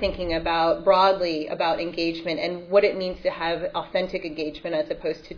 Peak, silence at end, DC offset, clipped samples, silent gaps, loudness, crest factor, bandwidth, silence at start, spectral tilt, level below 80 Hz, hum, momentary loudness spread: -6 dBFS; 0 s; under 0.1%; under 0.1%; none; -24 LUFS; 18 dB; 5.4 kHz; 0 s; -6 dB/octave; -46 dBFS; none; 9 LU